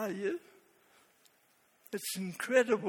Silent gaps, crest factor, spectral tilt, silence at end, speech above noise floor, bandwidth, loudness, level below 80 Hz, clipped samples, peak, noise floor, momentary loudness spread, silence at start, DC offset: none; 22 dB; -4 dB/octave; 0 s; 37 dB; 18 kHz; -34 LUFS; -84 dBFS; under 0.1%; -12 dBFS; -70 dBFS; 14 LU; 0 s; under 0.1%